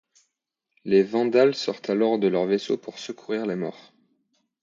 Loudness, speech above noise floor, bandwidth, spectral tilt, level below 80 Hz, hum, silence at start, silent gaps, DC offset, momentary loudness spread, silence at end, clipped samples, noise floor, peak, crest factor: -24 LUFS; 59 dB; 7.6 kHz; -6 dB/octave; -74 dBFS; none; 0.85 s; none; under 0.1%; 14 LU; 0.9 s; under 0.1%; -82 dBFS; -8 dBFS; 18 dB